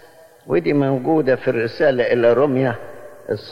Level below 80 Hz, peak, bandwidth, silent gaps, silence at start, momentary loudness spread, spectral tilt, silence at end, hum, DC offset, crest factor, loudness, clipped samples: -54 dBFS; -6 dBFS; 12 kHz; none; 0.45 s; 13 LU; -8 dB/octave; 0 s; none; under 0.1%; 14 dB; -18 LUFS; under 0.1%